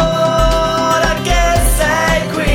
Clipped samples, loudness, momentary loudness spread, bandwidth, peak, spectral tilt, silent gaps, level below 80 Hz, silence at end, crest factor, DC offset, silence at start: under 0.1%; -13 LUFS; 1 LU; 17.5 kHz; 0 dBFS; -4 dB/octave; none; -18 dBFS; 0 s; 12 dB; under 0.1%; 0 s